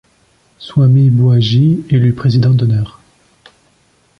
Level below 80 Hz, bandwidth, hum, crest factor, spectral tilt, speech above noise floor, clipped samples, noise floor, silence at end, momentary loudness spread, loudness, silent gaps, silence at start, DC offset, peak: -44 dBFS; 6.2 kHz; none; 10 dB; -9 dB/octave; 44 dB; under 0.1%; -54 dBFS; 1.3 s; 8 LU; -12 LUFS; none; 0.6 s; under 0.1%; -2 dBFS